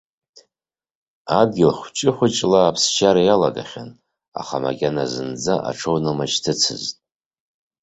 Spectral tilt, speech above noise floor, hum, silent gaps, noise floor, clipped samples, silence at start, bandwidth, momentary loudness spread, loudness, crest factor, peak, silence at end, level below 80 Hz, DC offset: -4 dB/octave; over 71 dB; none; 4.28-4.32 s; under -90 dBFS; under 0.1%; 1.25 s; 8.2 kHz; 16 LU; -19 LUFS; 20 dB; -2 dBFS; 0.9 s; -56 dBFS; under 0.1%